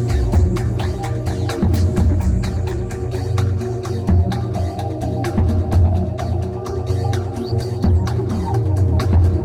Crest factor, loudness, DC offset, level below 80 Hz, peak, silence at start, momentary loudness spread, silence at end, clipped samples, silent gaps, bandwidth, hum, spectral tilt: 12 dB; -19 LUFS; under 0.1%; -26 dBFS; -6 dBFS; 0 s; 7 LU; 0 s; under 0.1%; none; 12 kHz; none; -8 dB/octave